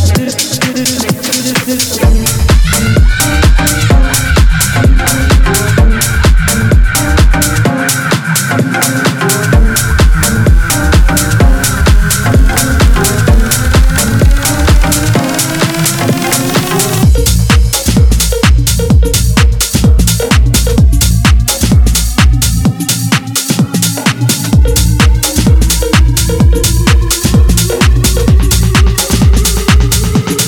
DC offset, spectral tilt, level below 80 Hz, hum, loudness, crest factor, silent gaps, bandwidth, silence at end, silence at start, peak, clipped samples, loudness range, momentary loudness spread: under 0.1%; -4 dB/octave; -10 dBFS; none; -9 LUFS; 8 dB; none; over 20 kHz; 0 s; 0 s; 0 dBFS; under 0.1%; 1 LU; 3 LU